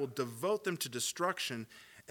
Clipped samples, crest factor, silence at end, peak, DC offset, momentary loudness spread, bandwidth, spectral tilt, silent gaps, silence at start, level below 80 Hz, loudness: under 0.1%; 18 dB; 0.1 s; -18 dBFS; under 0.1%; 12 LU; 19 kHz; -3 dB/octave; none; 0 s; -82 dBFS; -36 LUFS